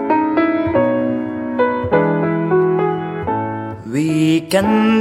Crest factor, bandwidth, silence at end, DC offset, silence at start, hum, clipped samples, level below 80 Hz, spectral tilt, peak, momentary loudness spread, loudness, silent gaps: 14 dB; 16 kHz; 0 s; under 0.1%; 0 s; none; under 0.1%; -48 dBFS; -7 dB/octave; -2 dBFS; 7 LU; -17 LUFS; none